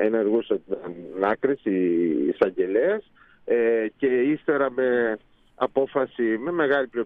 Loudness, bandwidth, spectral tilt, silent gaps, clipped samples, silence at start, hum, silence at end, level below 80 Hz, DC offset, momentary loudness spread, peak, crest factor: -24 LUFS; 4.5 kHz; -9 dB/octave; none; under 0.1%; 0 s; none; 0 s; -64 dBFS; under 0.1%; 7 LU; -6 dBFS; 16 dB